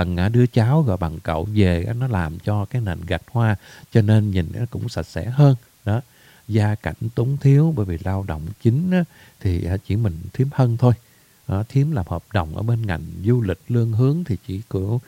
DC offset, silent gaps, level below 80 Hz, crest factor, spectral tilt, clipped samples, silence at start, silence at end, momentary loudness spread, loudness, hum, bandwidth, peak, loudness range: under 0.1%; none; -40 dBFS; 18 dB; -8.5 dB/octave; under 0.1%; 0 s; 0.05 s; 10 LU; -21 LUFS; none; 15.5 kHz; -2 dBFS; 2 LU